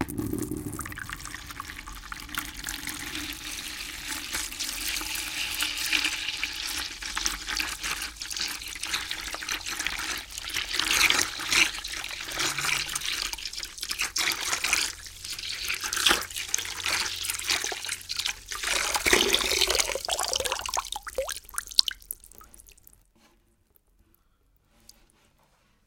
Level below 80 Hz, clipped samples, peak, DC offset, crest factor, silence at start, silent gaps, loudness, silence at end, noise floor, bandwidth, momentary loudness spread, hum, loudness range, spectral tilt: -50 dBFS; under 0.1%; -2 dBFS; under 0.1%; 30 dB; 0 s; none; -27 LUFS; 3.15 s; -66 dBFS; 17 kHz; 12 LU; none; 8 LU; -0.5 dB/octave